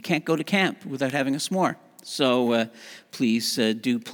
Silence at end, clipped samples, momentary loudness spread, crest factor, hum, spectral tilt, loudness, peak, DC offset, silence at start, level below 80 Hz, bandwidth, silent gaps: 0 s; under 0.1%; 11 LU; 18 dB; none; -4.5 dB/octave; -24 LUFS; -6 dBFS; under 0.1%; 0.05 s; -78 dBFS; over 20 kHz; none